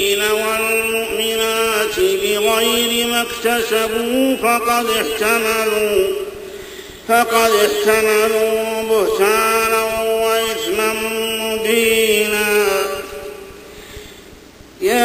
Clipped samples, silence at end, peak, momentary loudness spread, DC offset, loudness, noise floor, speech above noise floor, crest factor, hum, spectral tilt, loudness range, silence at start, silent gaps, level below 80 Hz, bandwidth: under 0.1%; 0 s; 0 dBFS; 16 LU; under 0.1%; -16 LUFS; -40 dBFS; 25 dB; 16 dB; none; -2 dB/octave; 2 LU; 0 s; none; -46 dBFS; 16 kHz